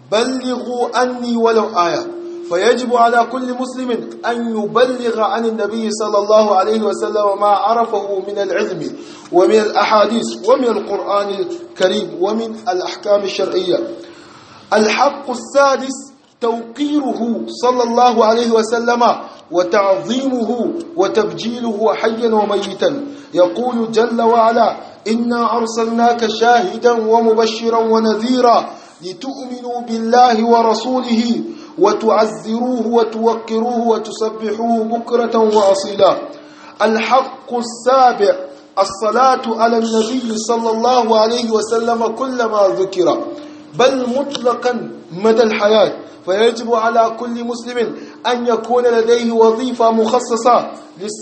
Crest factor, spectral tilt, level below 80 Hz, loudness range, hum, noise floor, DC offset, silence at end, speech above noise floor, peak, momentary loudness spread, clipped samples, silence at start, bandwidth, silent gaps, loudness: 14 dB; -4 dB/octave; -64 dBFS; 3 LU; none; -40 dBFS; under 0.1%; 0 s; 25 dB; 0 dBFS; 10 LU; under 0.1%; 0.1 s; 8.8 kHz; none; -15 LUFS